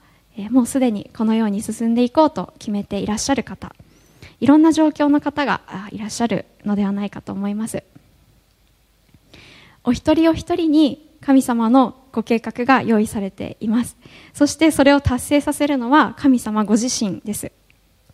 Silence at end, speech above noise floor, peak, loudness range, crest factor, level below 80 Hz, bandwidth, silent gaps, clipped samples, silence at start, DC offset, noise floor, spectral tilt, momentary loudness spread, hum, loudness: 0.65 s; 40 dB; 0 dBFS; 8 LU; 18 dB; -46 dBFS; 15 kHz; none; under 0.1%; 0.35 s; under 0.1%; -58 dBFS; -5 dB/octave; 13 LU; none; -18 LUFS